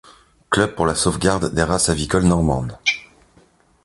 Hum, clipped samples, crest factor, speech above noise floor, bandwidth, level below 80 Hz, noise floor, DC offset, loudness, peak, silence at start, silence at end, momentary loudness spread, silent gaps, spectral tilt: none; under 0.1%; 20 dB; 36 dB; 11.5 kHz; -34 dBFS; -55 dBFS; under 0.1%; -19 LUFS; 0 dBFS; 0.5 s; 0.8 s; 4 LU; none; -4.5 dB/octave